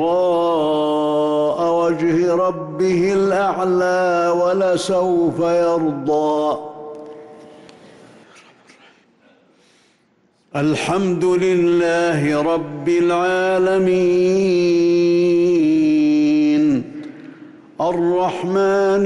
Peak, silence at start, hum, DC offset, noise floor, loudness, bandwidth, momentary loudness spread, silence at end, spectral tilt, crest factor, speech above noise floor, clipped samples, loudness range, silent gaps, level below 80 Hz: -10 dBFS; 0 s; none; under 0.1%; -60 dBFS; -17 LUFS; 11.5 kHz; 6 LU; 0 s; -6.5 dB/octave; 8 dB; 43 dB; under 0.1%; 9 LU; none; -56 dBFS